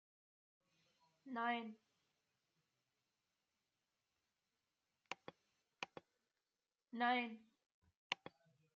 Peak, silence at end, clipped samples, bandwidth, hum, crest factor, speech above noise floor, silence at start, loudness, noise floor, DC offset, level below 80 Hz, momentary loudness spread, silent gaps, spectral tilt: -22 dBFS; 0.6 s; under 0.1%; 7.2 kHz; none; 30 dB; over 48 dB; 1.25 s; -45 LUFS; under -90 dBFS; under 0.1%; under -90 dBFS; 23 LU; 7.66-7.82 s, 7.95-8.10 s; -0.5 dB/octave